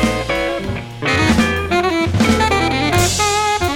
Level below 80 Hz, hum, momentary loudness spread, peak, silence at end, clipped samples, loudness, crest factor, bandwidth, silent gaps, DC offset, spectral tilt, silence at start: -30 dBFS; none; 6 LU; -2 dBFS; 0 s; under 0.1%; -16 LUFS; 14 dB; 19.5 kHz; none; under 0.1%; -4 dB/octave; 0 s